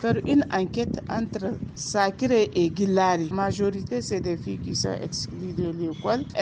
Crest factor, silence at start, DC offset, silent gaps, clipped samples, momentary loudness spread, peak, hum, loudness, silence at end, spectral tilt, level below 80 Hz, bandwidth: 16 dB; 0 s; under 0.1%; none; under 0.1%; 9 LU; -8 dBFS; none; -26 LUFS; 0 s; -5.5 dB/octave; -50 dBFS; 9.8 kHz